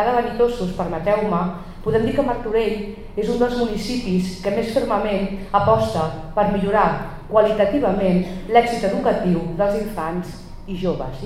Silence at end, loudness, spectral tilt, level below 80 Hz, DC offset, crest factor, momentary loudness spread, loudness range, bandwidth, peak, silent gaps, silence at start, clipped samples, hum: 0 s; -20 LUFS; -7 dB/octave; -36 dBFS; under 0.1%; 18 dB; 9 LU; 3 LU; 15 kHz; -2 dBFS; none; 0 s; under 0.1%; none